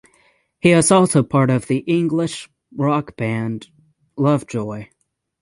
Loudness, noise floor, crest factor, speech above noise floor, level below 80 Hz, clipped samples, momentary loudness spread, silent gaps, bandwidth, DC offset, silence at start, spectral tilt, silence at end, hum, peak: -18 LUFS; -59 dBFS; 18 dB; 41 dB; -56 dBFS; under 0.1%; 18 LU; none; 11.5 kHz; under 0.1%; 0.65 s; -5.5 dB/octave; 0.6 s; none; -2 dBFS